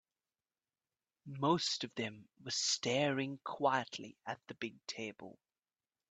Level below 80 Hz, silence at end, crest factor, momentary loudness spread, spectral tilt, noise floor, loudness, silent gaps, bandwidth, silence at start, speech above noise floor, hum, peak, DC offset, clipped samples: -80 dBFS; 0.8 s; 22 dB; 13 LU; -3.5 dB/octave; under -90 dBFS; -37 LUFS; none; 9 kHz; 1.25 s; over 52 dB; none; -18 dBFS; under 0.1%; under 0.1%